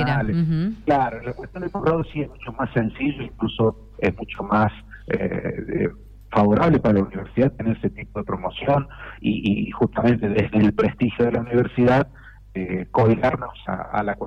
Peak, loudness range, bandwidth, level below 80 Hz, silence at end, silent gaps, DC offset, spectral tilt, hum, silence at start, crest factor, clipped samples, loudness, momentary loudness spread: -8 dBFS; 4 LU; 6.6 kHz; -42 dBFS; 0 s; none; under 0.1%; -9 dB/octave; none; 0 s; 14 dB; under 0.1%; -22 LUFS; 11 LU